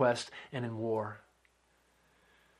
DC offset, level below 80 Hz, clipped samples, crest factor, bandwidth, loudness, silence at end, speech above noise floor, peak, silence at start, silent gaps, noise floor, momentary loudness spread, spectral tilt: under 0.1%; -76 dBFS; under 0.1%; 22 dB; 12 kHz; -36 LUFS; 1.4 s; 37 dB; -14 dBFS; 0 s; none; -71 dBFS; 10 LU; -5.5 dB/octave